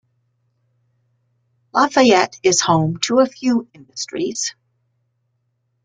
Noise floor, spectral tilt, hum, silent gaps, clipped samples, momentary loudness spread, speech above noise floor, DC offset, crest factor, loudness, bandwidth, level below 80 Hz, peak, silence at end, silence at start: -69 dBFS; -4 dB/octave; none; none; under 0.1%; 12 LU; 52 dB; under 0.1%; 18 dB; -17 LUFS; 9.4 kHz; -62 dBFS; -2 dBFS; 1.35 s; 1.75 s